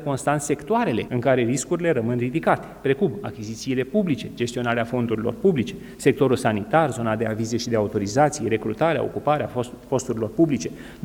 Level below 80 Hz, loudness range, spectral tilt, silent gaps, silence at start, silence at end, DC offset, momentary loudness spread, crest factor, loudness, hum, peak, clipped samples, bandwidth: -52 dBFS; 2 LU; -6 dB/octave; none; 0 s; 0 s; under 0.1%; 6 LU; 20 dB; -23 LUFS; none; -2 dBFS; under 0.1%; 19.5 kHz